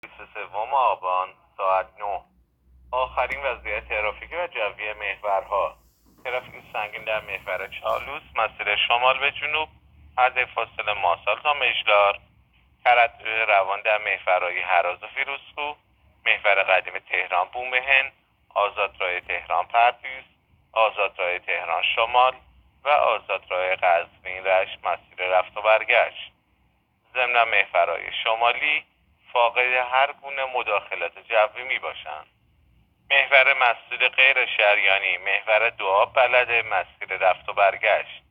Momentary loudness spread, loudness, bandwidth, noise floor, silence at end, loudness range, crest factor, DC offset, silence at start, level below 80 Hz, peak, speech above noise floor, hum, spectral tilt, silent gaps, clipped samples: 12 LU; -22 LUFS; 5.4 kHz; -66 dBFS; 0.15 s; 8 LU; 22 dB; under 0.1%; 0.05 s; -58 dBFS; -2 dBFS; 43 dB; none; -3.5 dB/octave; none; under 0.1%